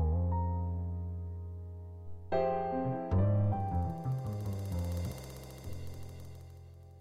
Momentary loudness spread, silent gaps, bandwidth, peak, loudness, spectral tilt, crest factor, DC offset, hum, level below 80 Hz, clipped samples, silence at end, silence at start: 17 LU; none; 15 kHz; -20 dBFS; -35 LUFS; -8.5 dB/octave; 16 dB; under 0.1%; none; -46 dBFS; under 0.1%; 0 s; 0 s